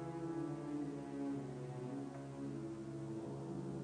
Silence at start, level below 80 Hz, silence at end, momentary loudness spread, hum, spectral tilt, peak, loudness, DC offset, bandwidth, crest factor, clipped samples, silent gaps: 0 s; -70 dBFS; 0 s; 4 LU; none; -8 dB/octave; -32 dBFS; -46 LUFS; under 0.1%; 10 kHz; 12 dB; under 0.1%; none